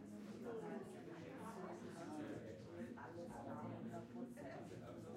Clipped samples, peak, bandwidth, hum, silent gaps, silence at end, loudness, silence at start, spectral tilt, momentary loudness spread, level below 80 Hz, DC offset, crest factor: under 0.1%; -38 dBFS; 16 kHz; none; none; 0 s; -53 LUFS; 0 s; -6.5 dB/octave; 4 LU; -80 dBFS; under 0.1%; 14 dB